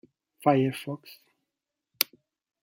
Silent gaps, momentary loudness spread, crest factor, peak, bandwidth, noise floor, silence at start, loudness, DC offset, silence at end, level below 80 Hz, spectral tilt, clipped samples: none; 14 LU; 30 dB; 0 dBFS; 17 kHz; -87 dBFS; 0.45 s; -28 LUFS; under 0.1%; 0.6 s; -74 dBFS; -5 dB/octave; under 0.1%